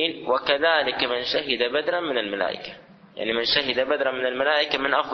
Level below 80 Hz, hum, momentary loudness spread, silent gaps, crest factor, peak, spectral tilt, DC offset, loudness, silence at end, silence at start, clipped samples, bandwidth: -60 dBFS; none; 7 LU; none; 20 dB; -4 dBFS; -4 dB/octave; under 0.1%; -23 LUFS; 0 s; 0 s; under 0.1%; 6.4 kHz